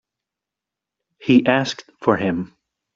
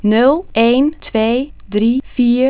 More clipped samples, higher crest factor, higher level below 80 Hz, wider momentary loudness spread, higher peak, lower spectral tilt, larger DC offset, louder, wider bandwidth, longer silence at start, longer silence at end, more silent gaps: neither; first, 20 dB vs 14 dB; second, -60 dBFS vs -42 dBFS; first, 14 LU vs 5 LU; about the same, -2 dBFS vs 0 dBFS; second, -6 dB/octave vs -10 dB/octave; neither; second, -19 LUFS vs -15 LUFS; first, 7.6 kHz vs 4 kHz; first, 1.2 s vs 0.05 s; first, 0.5 s vs 0 s; neither